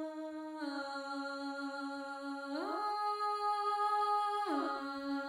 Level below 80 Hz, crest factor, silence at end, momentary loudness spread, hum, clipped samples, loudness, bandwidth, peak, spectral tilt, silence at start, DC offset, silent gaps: -82 dBFS; 14 dB; 0 s; 10 LU; none; under 0.1%; -37 LUFS; 16.5 kHz; -24 dBFS; -2.5 dB/octave; 0 s; under 0.1%; none